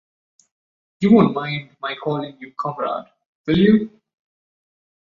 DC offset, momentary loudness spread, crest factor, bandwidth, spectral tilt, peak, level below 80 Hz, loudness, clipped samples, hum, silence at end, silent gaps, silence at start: under 0.1%; 16 LU; 20 dB; 6.8 kHz; -8.5 dB/octave; -2 dBFS; -54 dBFS; -19 LUFS; under 0.1%; none; 1.25 s; 3.26-3.44 s; 1 s